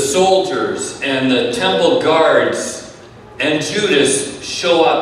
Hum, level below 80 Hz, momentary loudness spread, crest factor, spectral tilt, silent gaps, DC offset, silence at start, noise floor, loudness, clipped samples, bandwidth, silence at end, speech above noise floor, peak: none; -52 dBFS; 8 LU; 14 dB; -3 dB/octave; none; under 0.1%; 0 s; -37 dBFS; -15 LUFS; under 0.1%; 14 kHz; 0 s; 23 dB; 0 dBFS